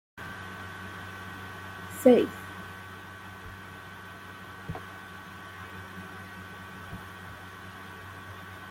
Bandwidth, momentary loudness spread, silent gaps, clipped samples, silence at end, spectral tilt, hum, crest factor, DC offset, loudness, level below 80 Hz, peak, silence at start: 16.5 kHz; 18 LU; none; under 0.1%; 0 s; -5.5 dB/octave; none; 26 dB; under 0.1%; -34 LUFS; -62 dBFS; -8 dBFS; 0.15 s